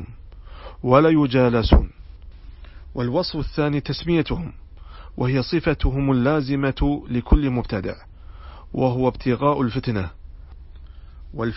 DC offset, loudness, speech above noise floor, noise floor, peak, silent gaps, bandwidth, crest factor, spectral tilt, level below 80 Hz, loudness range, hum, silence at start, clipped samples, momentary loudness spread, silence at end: under 0.1%; -21 LUFS; 20 dB; -40 dBFS; -2 dBFS; none; 5.8 kHz; 20 dB; -11 dB/octave; -28 dBFS; 4 LU; none; 0 s; under 0.1%; 18 LU; 0 s